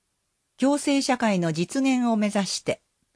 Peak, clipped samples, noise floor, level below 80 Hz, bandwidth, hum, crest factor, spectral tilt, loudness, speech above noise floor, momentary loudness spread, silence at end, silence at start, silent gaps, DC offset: -12 dBFS; under 0.1%; -75 dBFS; -68 dBFS; 10.5 kHz; none; 14 dB; -4.5 dB/octave; -24 LUFS; 52 dB; 5 LU; 0.4 s; 0.6 s; none; under 0.1%